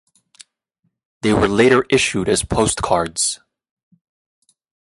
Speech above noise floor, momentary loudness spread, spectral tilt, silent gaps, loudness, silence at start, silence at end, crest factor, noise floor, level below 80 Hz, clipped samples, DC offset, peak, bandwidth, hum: 54 dB; 7 LU; -4 dB/octave; none; -17 LUFS; 1.25 s; 1.55 s; 18 dB; -71 dBFS; -40 dBFS; under 0.1%; under 0.1%; -2 dBFS; 11.5 kHz; none